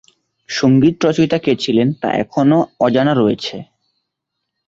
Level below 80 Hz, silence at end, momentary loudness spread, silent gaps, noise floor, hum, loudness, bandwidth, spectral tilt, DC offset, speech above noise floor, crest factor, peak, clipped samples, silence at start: -52 dBFS; 1.05 s; 9 LU; none; -77 dBFS; none; -15 LUFS; 7.8 kHz; -6.5 dB/octave; under 0.1%; 63 dB; 14 dB; -2 dBFS; under 0.1%; 0.5 s